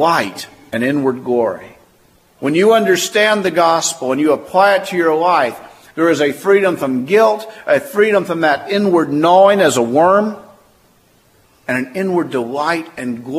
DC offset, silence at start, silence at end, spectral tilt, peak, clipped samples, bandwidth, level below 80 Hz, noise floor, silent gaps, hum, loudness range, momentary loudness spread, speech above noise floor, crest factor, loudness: under 0.1%; 0 s; 0 s; -4.5 dB/octave; 0 dBFS; under 0.1%; 15.5 kHz; -62 dBFS; -53 dBFS; none; none; 3 LU; 11 LU; 39 dB; 14 dB; -14 LUFS